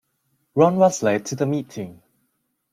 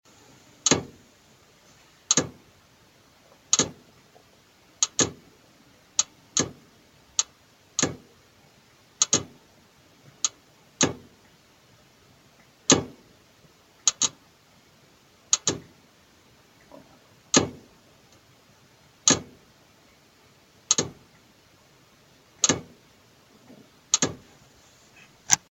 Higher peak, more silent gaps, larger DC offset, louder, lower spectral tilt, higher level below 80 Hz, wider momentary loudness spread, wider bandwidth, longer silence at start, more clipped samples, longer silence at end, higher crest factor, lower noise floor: second, -4 dBFS vs 0 dBFS; neither; neither; first, -20 LUFS vs -25 LUFS; first, -6 dB/octave vs -1.5 dB/octave; about the same, -64 dBFS vs -66 dBFS; first, 18 LU vs 13 LU; about the same, 15 kHz vs 16.5 kHz; about the same, 0.55 s vs 0.65 s; neither; first, 0.8 s vs 0.15 s; second, 18 dB vs 32 dB; first, -72 dBFS vs -58 dBFS